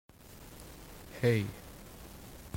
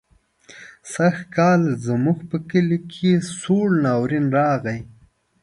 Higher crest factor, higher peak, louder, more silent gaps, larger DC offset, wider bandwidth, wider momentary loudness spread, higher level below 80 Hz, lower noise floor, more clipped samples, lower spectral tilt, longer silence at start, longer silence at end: first, 22 dB vs 16 dB; second, -16 dBFS vs -4 dBFS; second, -32 LUFS vs -20 LUFS; neither; neither; first, 16.5 kHz vs 11.5 kHz; first, 21 LU vs 7 LU; about the same, -56 dBFS vs -58 dBFS; about the same, -52 dBFS vs -51 dBFS; neither; about the same, -6.5 dB/octave vs -7 dB/octave; second, 0.3 s vs 0.55 s; second, 0 s vs 0.55 s